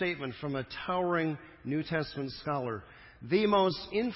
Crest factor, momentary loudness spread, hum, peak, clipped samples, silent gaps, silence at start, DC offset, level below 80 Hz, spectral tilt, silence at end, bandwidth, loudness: 18 dB; 11 LU; none; -14 dBFS; under 0.1%; none; 0 s; under 0.1%; -60 dBFS; -9.5 dB/octave; 0 s; 5.8 kHz; -32 LUFS